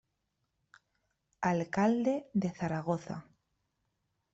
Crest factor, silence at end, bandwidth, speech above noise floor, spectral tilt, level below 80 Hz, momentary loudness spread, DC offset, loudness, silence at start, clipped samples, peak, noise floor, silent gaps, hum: 18 dB; 1.1 s; 8 kHz; 50 dB; -7.5 dB/octave; -70 dBFS; 8 LU; under 0.1%; -33 LUFS; 1.4 s; under 0.1%; -16 dBFS; -82 dBFS; none; none